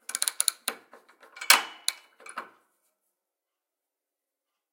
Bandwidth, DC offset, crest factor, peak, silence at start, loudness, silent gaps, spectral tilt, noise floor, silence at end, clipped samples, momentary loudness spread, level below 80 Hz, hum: 17 kHz; under 0.1%; 32 dB; 0 dBFS; 0.1 s; -25 LUFS; none; 3.5 dB/octave; -88 dBFS; 2.3 s; under 0.1%; 22 LU; under -90 dBFS; none